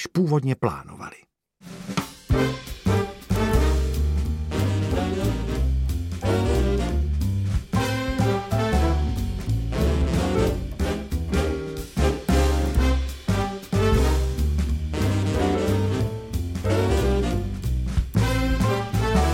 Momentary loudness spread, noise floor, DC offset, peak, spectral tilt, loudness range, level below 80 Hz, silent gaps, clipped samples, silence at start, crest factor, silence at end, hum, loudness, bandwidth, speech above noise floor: 6 LU; -45 dBFS; under 0.1%; -8 dBFS; -6.5 dB/octave; 2 LU; -26 dBFS; none; under 0.1%; 0 s; 16 dB; 0 s; none; -24 LUFS; 16.5 kHz; 20 dB